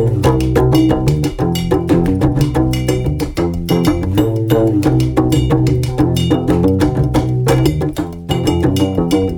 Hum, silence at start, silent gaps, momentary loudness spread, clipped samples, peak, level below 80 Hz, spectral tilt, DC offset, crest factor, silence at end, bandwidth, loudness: none; 0 s; none; 5 LU; under 0.1%; 0 dBFS; -26 dBFS; -7 dB/octave; under 0.1%; 14 dB; 0 s; 18.5 kHz; -14 LUFS